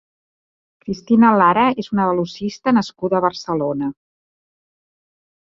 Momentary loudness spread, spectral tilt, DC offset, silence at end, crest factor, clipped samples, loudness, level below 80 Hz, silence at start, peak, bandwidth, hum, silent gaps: 14 LU; -6.5 dB/octave; under 0.1%; 1.5 s; 18 dB; under 0.1%; -17 LUFS; -56 dBFS; 0.85 s; -2 dBFS; 7.4 kHz; none; none